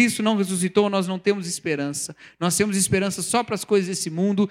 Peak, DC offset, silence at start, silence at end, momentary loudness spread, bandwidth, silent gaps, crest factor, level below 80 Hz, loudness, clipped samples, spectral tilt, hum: -6 dBFS; under 0.1%; 0 s; 0 s; 6 LU; 16 kHz; none; 16 dB; -58 dBFS; -22 LUFS; under 0.1%; -4 dB/octave; none